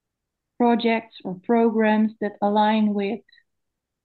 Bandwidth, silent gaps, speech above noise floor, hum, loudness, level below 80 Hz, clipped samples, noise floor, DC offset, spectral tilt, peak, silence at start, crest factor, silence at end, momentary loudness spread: 4.5 kHz; none; 61 dB; none; -21 LUFS; -74 dBFS; under 0.1%; -82 dBFS; under 0.1%; -9.5 dB/octave; -8 dBFS; 0.6 s; 14 dB; 0.85 s; 11 LU